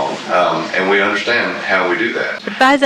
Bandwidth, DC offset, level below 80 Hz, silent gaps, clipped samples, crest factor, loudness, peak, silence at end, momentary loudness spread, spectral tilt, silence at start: 14 kHz; under 0.1%; -60 dBFS; none; under 0.1%; 14 dB; -15 LUFS; 0 dBFS; 0 s; 4 LU; -4 dB/octave; 0 s